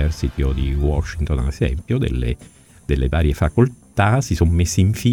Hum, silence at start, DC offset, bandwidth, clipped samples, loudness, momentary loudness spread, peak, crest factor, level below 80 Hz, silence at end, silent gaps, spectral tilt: none; 0 s; under 0.1%; 17.5 kHz; under 0.1%; -20 LUFS; 6 LU; -2 dBFS; 18 dB; -24 dBFS; 0 s; none; -6.5 dB/octave